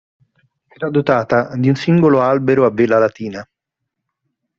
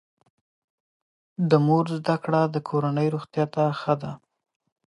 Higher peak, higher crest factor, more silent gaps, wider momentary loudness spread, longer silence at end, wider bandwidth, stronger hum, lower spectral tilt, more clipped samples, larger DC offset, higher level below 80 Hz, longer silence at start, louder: first, 0 dBFS vs -4 dBFS; about the same, 16 dB vs 20 dB; neither; first, 14 LU vs 9 LU; first, 1.15 s vs 0.75 s; second, 7.2 kHz vs 11 kHz; neither; second, -7 dB/octave vs -8.5 dB/octave; neither; neither; first, -56 dBFS vs -68 dBFS; second, 0.8 s vs 1.4 s; first, -15 LUFS vs -24 LUFS